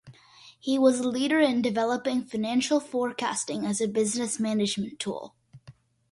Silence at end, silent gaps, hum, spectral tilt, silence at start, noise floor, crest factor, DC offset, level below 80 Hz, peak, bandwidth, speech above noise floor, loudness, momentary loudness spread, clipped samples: 0.4 s; none; none; -4 dB/octave; 0.05 s; -54 dBFS; 18 dB; under 0.1%; -70 dBFS; -10 dBFS; 11.5 kHz; 28 dB; -27 LUFS; 10 LU; under 0.1%